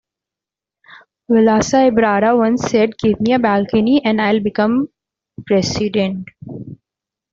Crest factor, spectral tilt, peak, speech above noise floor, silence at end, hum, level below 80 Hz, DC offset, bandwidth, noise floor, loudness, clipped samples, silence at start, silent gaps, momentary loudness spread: 14 dB; -5.5 dB/octave; -2 dBFS; 72 dB; 0.6 s; none; -48 dBFS; under 0.1%; 7.6 kHz; -87 dBFS; -15 LUFS; under 0.1%; 1.3 s; none; 15 LU